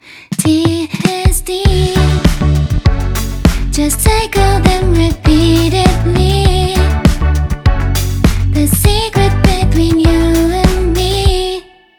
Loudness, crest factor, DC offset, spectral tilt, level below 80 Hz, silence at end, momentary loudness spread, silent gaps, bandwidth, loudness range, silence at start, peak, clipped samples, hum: -12 LUFS; 10 dB; under 0.1%; -5.5 dB/octave; -16 dBFS; 0.35 s; 4 LU; none; over 20 kHz; 2 LU; 0.1 s; 0 dBFS; under 0.1%; none